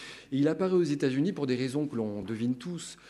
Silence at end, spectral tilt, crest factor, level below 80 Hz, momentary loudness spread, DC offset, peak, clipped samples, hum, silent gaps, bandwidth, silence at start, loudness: 0 s; -6.5 dB/octave; 16 dB; -68 dBFS; 8 LU; under 0.1%; -14 dBFS; under 0.1%; none; none; 12 kHz; 0 s; -30 LUFS